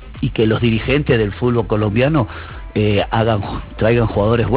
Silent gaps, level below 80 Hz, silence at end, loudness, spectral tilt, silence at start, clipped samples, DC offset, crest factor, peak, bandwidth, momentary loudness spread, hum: none; -32 dBFS; 0 s; -17 LUFS; -11.5 dB/octave; 0 s; under 0.1%; 0.3%; 14 dB; -2 dBFS; 4 kHz; 7 LU; none